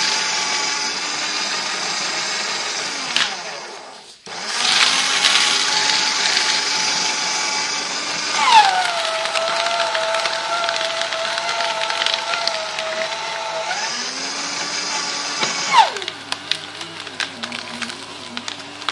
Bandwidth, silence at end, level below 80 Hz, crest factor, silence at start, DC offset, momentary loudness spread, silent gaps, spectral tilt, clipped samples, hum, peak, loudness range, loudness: 11.5 kHz; 0 s; -70 dBFS; 20 dB; 0 s; under 0.1%; 14 LU; none; 0.5 dB/octave; under 0.1%; none; 0 dBFS; 6 LU; -18 LUFS